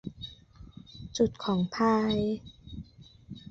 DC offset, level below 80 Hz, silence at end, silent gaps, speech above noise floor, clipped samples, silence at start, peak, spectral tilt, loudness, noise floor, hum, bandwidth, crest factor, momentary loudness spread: under 0.1%; -54 dBFS; 0 s; none; 25 dB; under 0.1%; 0.05 s; -12 dBFS; -6 dB/octave; -29 LUFS; -52 dBFS; none; 7.8 kHz; 18 dB; 22 LU